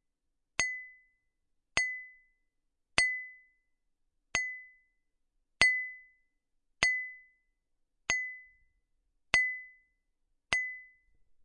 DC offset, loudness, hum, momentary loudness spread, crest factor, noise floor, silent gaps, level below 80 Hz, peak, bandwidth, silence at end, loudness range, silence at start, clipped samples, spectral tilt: under 0.1%; -31 LUFS; none; 20 LU; 34 dB; -81 dBFS; none; -62 dBFS; -4 dBFS; 11 kHz; 0.6 s; 4 LU; 0.6 s; under 0.1%; 0 dB/octave